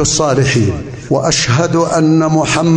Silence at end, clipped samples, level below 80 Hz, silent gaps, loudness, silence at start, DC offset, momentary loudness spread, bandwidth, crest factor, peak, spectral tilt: 0 s; under 0.1%; -36 dBFS; none; -12 LUFS; 0 s; under 0.1%; 6 LU; 10 kHz; 10 dB; -2 dBFS; -4.5 dB/octave